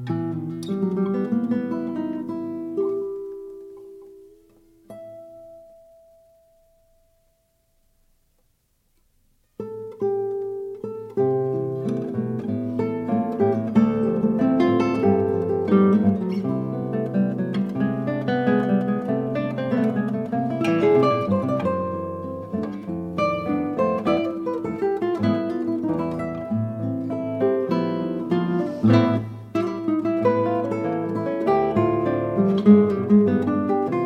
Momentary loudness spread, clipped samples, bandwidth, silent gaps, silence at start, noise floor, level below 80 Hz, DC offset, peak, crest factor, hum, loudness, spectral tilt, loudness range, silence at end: 12 LU; under 0.1%; 6.6 kHz; none; 0 s; -66 dBFS; -58 dBFS; under 0.1%; -2 dBFS; 20 dB; none; -23 LUFS; -9 dB/octave; 11 LU; 0 s